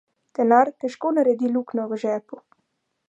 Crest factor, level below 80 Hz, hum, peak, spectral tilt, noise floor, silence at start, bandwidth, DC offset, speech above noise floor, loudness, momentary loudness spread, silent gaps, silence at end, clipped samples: 20 dB; -80 dBFS; none; -2 dBFS; -6.5 dB/octave; -74 dBFS; 0.4 s; 8.2 kHz; under 0.1%; 52 dB; -22 LUFS; 10 LU; none; 0.7 s; under 0.1%